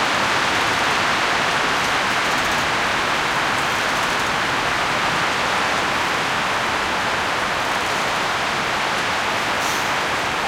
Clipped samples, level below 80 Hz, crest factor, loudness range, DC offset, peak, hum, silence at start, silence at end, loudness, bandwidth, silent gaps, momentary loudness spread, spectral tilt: under 0.1%; -46 dBFS; 14 dB; 2 LU; under 0.1%; -6 dBFS; none; 0 s; 0 s; -19 LUFS; 16.5 kHz; none; 2 LU; -2 dB/octave